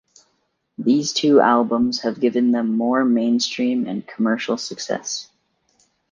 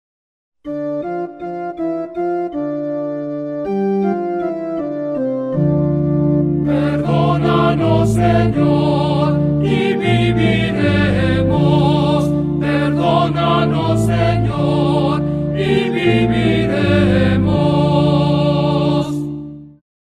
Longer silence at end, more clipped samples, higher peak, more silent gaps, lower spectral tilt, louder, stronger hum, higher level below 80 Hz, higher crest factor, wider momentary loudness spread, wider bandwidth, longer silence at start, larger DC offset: first, 0.9 s vs 0.45 s; neither; about the same, -2 dBFS vs -2 dBFS; neither; second, -4 dB/octave vs -8 dB/octave; second, -20 LUFS vs -16 LUFS; neither; second, -68 dBFS vs -36 dBFS; about the same, 18 dB vs 14 dB; about the same, 11 LU vs 9 LU; second, 7.6 kHz vs 10.5 kHz; first, 0.8 s vs 0.65 s; neither